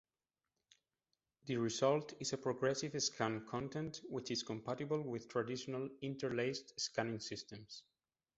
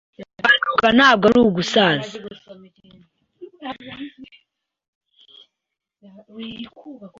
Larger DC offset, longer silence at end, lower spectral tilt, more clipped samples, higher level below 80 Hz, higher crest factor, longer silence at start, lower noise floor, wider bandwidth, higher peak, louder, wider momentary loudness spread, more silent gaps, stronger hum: neither; first, 0.55 s vs 0.1 s; about the same, -4 dB/octave vs -4.5 dB/octave; neither; second, -76 dBFS vs -54 dBFS; about the same, 22 dB vs 20 dB; first, 1.45 s vs 0.2 s; first, under -90 dBFS vs -83 dBFS; about the same, 8 kHz vs 7.8 kHz; second, -20 dBFS vs -2 dBFS; second, -41 LUFS vs -15 LUFS; second, 10 LU vs 24 LU; second, none vs 4.88-5.01 s; neither